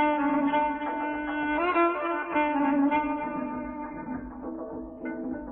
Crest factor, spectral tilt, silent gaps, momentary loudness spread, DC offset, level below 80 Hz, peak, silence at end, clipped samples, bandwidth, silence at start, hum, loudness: 14 dB; -9 dB/octave; none; 13 LU; under 0.1%; -54 dBFS; -14 dBFS; 0 s; under 0.1%; 4 kHz; 0 s; none; -28 LUFS